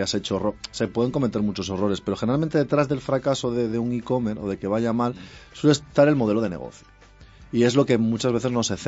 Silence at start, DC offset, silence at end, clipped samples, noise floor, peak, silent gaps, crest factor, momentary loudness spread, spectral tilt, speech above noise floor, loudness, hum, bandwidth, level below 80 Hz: 0 s; under 0.1%; 0 s; under 0.1%; -48 dBFS; -4 dBFS; none; 18 dB; 9 LU; -6 dB/octave; 25 dB; -23 LUFS; none; 8 kHz; -52 dBFS